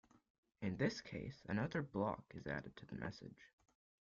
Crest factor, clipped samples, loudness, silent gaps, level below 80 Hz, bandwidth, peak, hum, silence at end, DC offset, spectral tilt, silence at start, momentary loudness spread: 22 dB; under 0.1%; -45 LUFS; none; -70 dBFS; 7.4 kHz; -24 dBFS; none; 0.65 s; under 0.1%; -5.5 dB/octave; 0.6 s; 12 LU